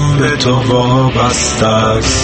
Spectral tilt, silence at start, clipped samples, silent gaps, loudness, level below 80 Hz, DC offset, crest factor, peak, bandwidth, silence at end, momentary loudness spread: -4.5 dB/octave; 0 s; under 0.1%; none; -11 LUFS; -26 dBFS; under 0.1%; 12 dB; 0 dBFS; 8.8 kHz; 0 s; 1 LU